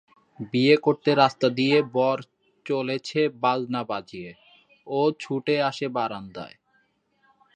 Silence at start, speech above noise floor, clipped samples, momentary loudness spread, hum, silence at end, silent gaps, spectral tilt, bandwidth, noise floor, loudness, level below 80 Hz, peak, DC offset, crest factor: 0.4 s; 44 dB; under 0.1%; 19 LU; none; 1.05 s; none; -6 dB/octave; 9 kHz; -67 dBFS; -24 LUFS; -70 dBFS; -2 dBFS; under 0.1%; 22 dB